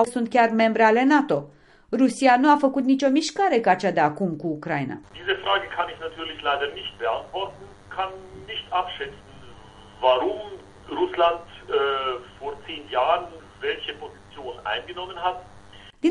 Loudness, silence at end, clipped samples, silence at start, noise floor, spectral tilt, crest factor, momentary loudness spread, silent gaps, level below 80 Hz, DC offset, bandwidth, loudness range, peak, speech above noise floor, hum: -23 LUFS; 0 s; under 0.1%; 0 s; -47 dBFS; -4.5 dB/octave; 20 dB; 16 LU; none; -56 dBFS; under 0.1%; 11.5 kHz; 9 LU; -4 dBFS; 24 dB; none